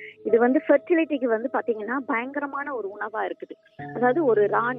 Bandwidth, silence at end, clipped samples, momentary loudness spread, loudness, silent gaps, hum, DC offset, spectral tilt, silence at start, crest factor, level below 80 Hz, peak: 3.8 kHz; 0 s; under 0.1%; 12 LU; -24 LUFS; none; none; under 0.1%; -9.5 dB/octave; 0 s; 16 dB; -74 dBFS; -8 dBFS